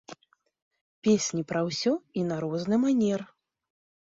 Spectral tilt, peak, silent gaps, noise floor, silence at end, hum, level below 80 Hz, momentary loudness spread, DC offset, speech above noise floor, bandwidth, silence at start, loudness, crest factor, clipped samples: -5 dB/octave; -12 dBFS; 0.62-0.71 s, 0.81-1.02 s; -53 dBFS; 0.8 s; none; -70 dBFS; 6 LU; under 0.1%; 27 dB; 7.8 kHz; 0.1 s; -27 LUFS; 16 dB; under 0.1%